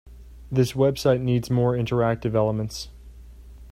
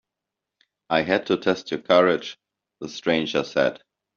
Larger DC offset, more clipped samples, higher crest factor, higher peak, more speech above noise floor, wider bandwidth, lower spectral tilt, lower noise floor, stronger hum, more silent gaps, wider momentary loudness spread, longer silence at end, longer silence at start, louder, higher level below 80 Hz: neither; neither; about the same, 18 dB vs 22 dB; about the same, -6 dBFS vs -4 dBFS; second, 22 dB vs 63 dB; first, 15.5 kHz vs 7.2 kHz; first, -7 dB/octave vs -3 dB/octave; second, -44 dBFS vs -85 dBFS; neither; neither; about the same, 10 LU vs 12 LU; second, 0 s vs 0.4 s; second, 0.05 s vs 0.9 s; about the same, -23 LUFS vs -22 LUFS; first, -44 dBFS vs -64 dBFS